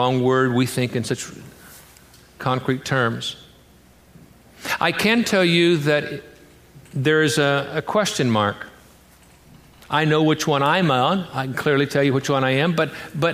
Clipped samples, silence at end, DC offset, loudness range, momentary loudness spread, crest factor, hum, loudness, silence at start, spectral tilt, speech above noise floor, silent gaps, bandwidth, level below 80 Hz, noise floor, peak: under 0.1%; 0 s; under 0.1%; 6 LU; 11 LU; 18 dB; none; -20 LUFS; 0 s; -5 dB/octave; 31 dB; none; 15.5 kHz; -56 dBFS; -51 dBFS; -4 dBFS